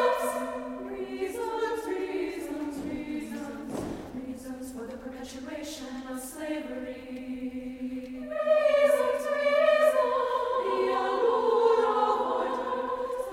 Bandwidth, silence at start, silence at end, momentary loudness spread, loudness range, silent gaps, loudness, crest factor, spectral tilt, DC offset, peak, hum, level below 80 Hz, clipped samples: 16 kHz; 0 s; 0 s; 16 LU; 13 LU; none; -29 LUFS; 18 dB; -4 dB/octave; under 0.1%; -10 dBFS; none; -58 dBFS; under 0.1%